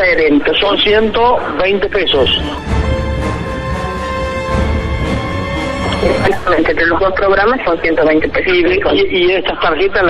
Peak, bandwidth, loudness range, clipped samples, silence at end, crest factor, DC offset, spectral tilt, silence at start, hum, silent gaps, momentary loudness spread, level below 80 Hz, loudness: -2 dBFS; 12 kHz; 5 LU; under 0.1%; 0 s; 12 dB; under 0.1%; -6 dB/octave; 0 s; none; none; 7 LU; -24 dBFS; -13 LUFS